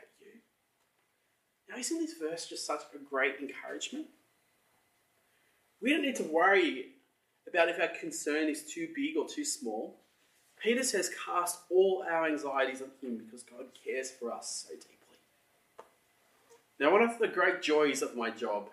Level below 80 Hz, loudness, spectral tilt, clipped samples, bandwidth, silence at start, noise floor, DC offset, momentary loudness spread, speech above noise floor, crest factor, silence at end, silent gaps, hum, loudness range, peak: under -90 dBFS; -32 LUFS; -2 dB/octave; under 0.1%; 13.5 kHz; 0.25 s; -76 dBFS; under 0.1%; 15 LU; 44 dB; 22 dB; 0 s; none; none; 9 LU; -12 dBFS